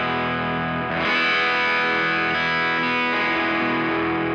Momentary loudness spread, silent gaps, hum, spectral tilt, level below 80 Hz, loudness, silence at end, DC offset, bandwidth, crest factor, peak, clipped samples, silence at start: 5 LU; none; none; -5.5 dB/octave; -56 dBFS; -20 LUFS; 0 s; under 0.1%; 8.8 kHz; 12 dB; -10 dBFS; under 0.1%; 0 s